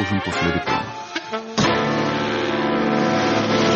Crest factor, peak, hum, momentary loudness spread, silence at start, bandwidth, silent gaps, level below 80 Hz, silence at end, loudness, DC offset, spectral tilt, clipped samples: 14 dB; -6 dBFS; none; 8 LU; 0 s; 8.2 kHz; none; -48 dBFS; 0 s; -21 LUFS; under 0.1%; -5 dB/octave; under 0.1%